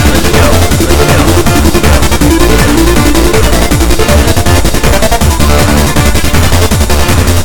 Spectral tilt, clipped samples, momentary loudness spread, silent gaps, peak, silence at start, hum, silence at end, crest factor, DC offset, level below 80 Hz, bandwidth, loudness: -4.5 dB/octave; 4%; 2 LU; none; 0 dBFS; 0 s; none; 0 s; 6 dB; 6%; -12 dBFS; 19 kHz; -7 LUFS